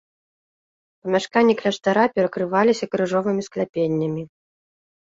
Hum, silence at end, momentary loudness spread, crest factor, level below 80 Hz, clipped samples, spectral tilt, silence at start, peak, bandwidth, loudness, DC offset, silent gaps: none; 0.85 s; 9 LU; 18 dB; -64 dBFS; under 0.1%; -6 dB/octave; 1.05 s; -4 dBFS; 7.8 kHz; -21 LUFS; under 0.1%; 3.69-3.73 s